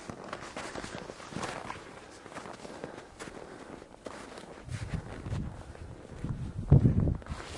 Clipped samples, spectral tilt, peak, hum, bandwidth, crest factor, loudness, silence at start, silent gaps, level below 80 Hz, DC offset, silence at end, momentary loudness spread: under 0.1%; -7 dB/octave; -10 dBFS; none; 11.5 kHz; 24 dB; -34 LUFS; 0 s; none; -44 dBFS; under 0.1%; 0 s; 20 LU